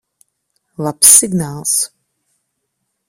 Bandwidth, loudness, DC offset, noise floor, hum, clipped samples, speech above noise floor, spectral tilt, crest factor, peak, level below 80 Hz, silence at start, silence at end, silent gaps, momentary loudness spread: over 20 kHz; -10 LUFS; under 0.1%; -72 dBFS; none; 0.5%; 59 dB; -2.5 dB/octave; 16 dB; 0 dBFS; -56 dBFS; 0.8 s; 1.25 s; none; 17 LU